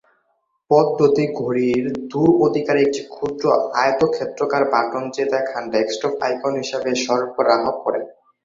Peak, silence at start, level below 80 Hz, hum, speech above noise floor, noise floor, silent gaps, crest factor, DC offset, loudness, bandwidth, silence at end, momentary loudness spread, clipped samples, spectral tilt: -2 dBFS; 0.7 s; -60 dBFS; none; 50 dB; -68 dBFS; none; 18 dB; under 0.1%; -19 LUFS; 7.6 kHz; 0.35 s; 7 LU; under 0.1%; -5.5 dB/octave